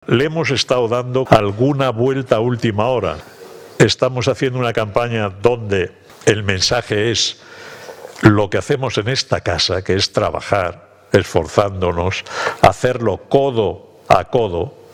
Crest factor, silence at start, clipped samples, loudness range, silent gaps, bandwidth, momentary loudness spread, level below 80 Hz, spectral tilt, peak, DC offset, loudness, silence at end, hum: 16 dB; 0.1 s; under 0.1%; 1 LU; none; 16 kHz; 8 LU; -42 dBFS; -5 dB/octave; 0 dBFS; under 0.1%; -17 LUFS; 0.25 s; none